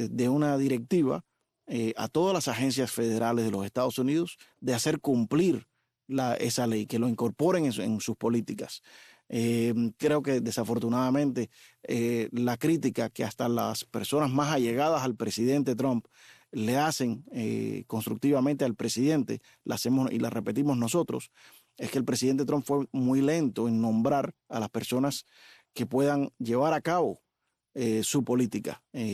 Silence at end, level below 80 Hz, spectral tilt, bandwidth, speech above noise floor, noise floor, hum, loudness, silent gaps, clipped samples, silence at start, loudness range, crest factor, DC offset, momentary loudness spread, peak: 0 s; -70 dBFS; -5.5 dB/octave; 14.5 kHz; 54 dB; -82 dBFS; none; -29 LUFS; none; under 0.1%; 0 s; 2 LU; 16 dB; under 0.1%; 9 LU; -14 dBFS